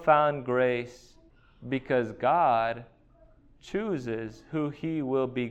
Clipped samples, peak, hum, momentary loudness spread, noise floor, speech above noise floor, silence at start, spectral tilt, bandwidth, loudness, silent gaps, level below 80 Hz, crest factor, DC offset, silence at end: under 0.1%; -8 dBFS; none; 12 LU; -58 dBFS; 31 dB; 0 s; -7.5 dB/octave; 8.6 kHz; -28 LUFS; none; -58 dBFS; 20 dB; under 0.1%; 0 s